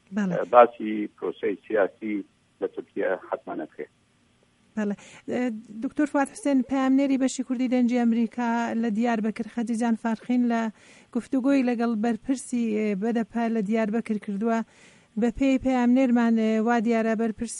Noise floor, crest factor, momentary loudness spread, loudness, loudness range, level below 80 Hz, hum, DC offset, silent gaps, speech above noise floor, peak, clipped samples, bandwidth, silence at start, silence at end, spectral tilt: -63 dBFS; 22 dB; 12 LU; -25 LUFS; 7 LU; -58 dBFS; none; under 0.1%; none; 39 dB; -2 dBFS; under 0.1%; 11.5 kHz; 0.1 s; 0 s; -6 dB/octave